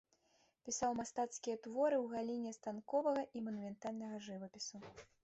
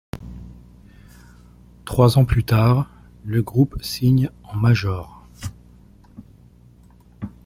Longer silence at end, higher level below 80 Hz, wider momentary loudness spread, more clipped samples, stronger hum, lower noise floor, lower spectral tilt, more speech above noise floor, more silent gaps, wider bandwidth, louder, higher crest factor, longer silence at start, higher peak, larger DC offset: about the same, 0.2 s vs 0.2 s; second, -78 dBFS vs -40 dBFS; second, 12 LU vs 21 LU; neither; neither; first, -77 dBFS vs -49 dBFS; second, -4 dB/octave vs -7 dB/octave; about the same, 35 dB vs 32 dB; neither; second, 8.2 kHz vs 16 kHz; second, -42 LUFS vs -19 LUFS; about the same, 16 dB vs 20 dB; first, 0.65 s vs 0.15 s; second, -26 dBFS vs -2 dBFS; neither